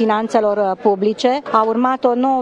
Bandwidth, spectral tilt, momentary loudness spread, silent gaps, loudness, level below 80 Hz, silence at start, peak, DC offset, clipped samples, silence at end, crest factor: 9.8 kHz; -5.5 dB/octave; 1 LU; none; -16 LUFS; -62 dBFS; 0 s; 0 dBFS; under 0.1%; under 0.1%; 0 s; 16 dB